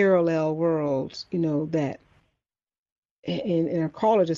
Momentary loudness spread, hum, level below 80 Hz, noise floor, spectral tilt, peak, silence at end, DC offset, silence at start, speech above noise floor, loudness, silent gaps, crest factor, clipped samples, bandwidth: 10 LU; none; -64 dBFS; -83 dBFS; -7.5 dB/octave; -8 dBFS; 0 s; under 0.1%; 0 s; 59 dB; -25 LUFS; 2.78-2.86 s, 2.92-3.03 s, 3.11-3.23 s; 16 dB; under 0.1%; 7.4 kHz